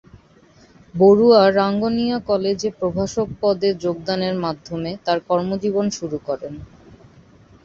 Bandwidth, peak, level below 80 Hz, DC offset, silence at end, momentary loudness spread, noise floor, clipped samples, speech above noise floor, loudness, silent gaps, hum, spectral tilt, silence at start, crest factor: 7.6 kHz; -2 dBFS; -50 dBFS; under 0.1%; 1 s; 15 LU; -51 dBFS; under 0.1%; 32 dB; -19 LUFS; none; none; -6 dB/octave; 0.95 s; 18 dB